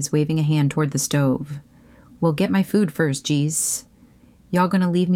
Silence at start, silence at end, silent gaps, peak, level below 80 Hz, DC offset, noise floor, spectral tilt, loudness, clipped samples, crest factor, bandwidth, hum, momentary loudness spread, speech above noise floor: 0 s; 0 s; none; -8 dBFS; -56 dBFS; under 0.1%; -51 dBFS; -5.5 dB/octave; -21 LUFS; under 0.1%; 14 dB; 16.5 kHz; none; 6 LU; 31 dB